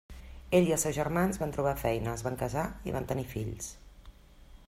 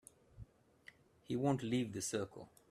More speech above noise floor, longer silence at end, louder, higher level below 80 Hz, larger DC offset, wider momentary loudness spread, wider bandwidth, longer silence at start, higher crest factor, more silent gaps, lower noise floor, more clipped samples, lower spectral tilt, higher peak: about the same, 23 dB vs 25 dB; second, 0.05 s vs 0.25 s; first, -31 LUFS vs -39 LUFS; first, -48 dBFS vs -70 dBFS; neither; second, 13 LU vs 25 LU; first, 16 kHz vs 14.5 kHz; second, 0.1 s vs 0.35 s; about the same, 20 dB vs 20 dB; neither; second, -54 dBFS vs -64 dBFS; neither; about the same, -5.5 dB/octave vs -5.5 dB/octave; first, -12 dBFS vs -22 dBFS